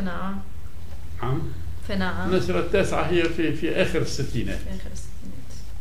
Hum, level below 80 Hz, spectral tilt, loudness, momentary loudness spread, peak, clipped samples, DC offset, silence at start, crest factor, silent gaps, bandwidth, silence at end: none; -38 dBFS; -6 dB/octave; -26 LUFS; 18 LU; -8 dBFS; under 0.1%; 6%; 0 s; 20 dB; none; 16 kHz; 0 s